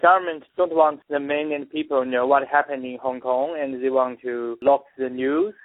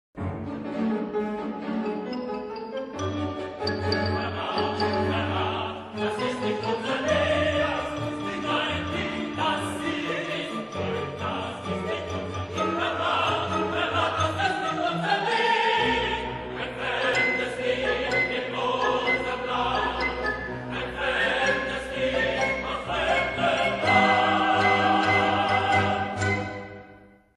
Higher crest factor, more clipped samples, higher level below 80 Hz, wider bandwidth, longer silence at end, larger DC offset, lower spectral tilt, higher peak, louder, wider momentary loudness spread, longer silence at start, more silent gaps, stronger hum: about the same, 18 dB vs 18 dB; neither; second, -68 dBFS vs -50 dBFS; second, 4 kHz vs 12.5 kHz; second, 0.1 s vs 0.3 s; neither; first, -9 dB/octave vs -5 dB/octave; first, -4 dBFS vs -8 dBFS; first, -23 LUFS vs -26 LUFS; about the same, 9 LU vs 10 LU; second, 0 s vs 0.15 s; neither; neither